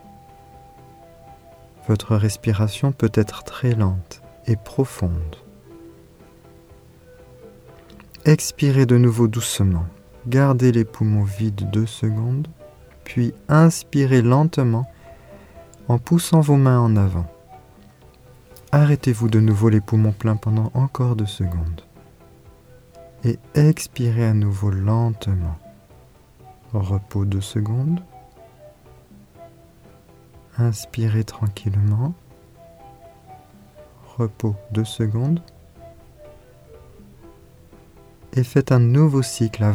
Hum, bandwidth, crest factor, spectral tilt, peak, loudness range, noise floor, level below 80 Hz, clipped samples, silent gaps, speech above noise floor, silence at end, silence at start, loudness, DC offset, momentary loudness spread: none; 15.5 kHz; 18 dB; -7 dB/octave; -2 dBFS; 9 LU; -49 dBFS; -44 dBFS; under 0.1%; none; 31 dB; 0 s; 1.3 s; -20 LUFS; under 0.1%; 12 LU